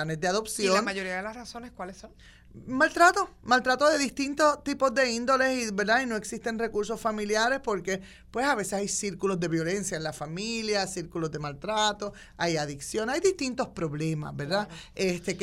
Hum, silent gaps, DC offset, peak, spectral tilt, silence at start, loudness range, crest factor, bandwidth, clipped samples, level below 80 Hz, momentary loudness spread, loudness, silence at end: none; none; under 0.1%; -8 dBFS; -3.5 dB/octave; 0 s; 6 LU; 20 dB; 16 kHz; under 0.1%; -56 dBFS; 11 LU; -27 LUFS; 0 s